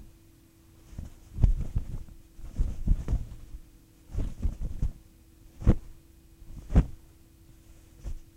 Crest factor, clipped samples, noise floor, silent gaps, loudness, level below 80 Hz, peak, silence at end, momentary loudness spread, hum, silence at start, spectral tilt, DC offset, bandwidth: 24 dB; under 0.1%; -57 dBFS; none; -32 LUFS; -32 dBFS; -6 dBFS; 0.1 s; 23 LU; none; 0 s; -8.5 dB/octave; under 0.1%; 9.6 kHz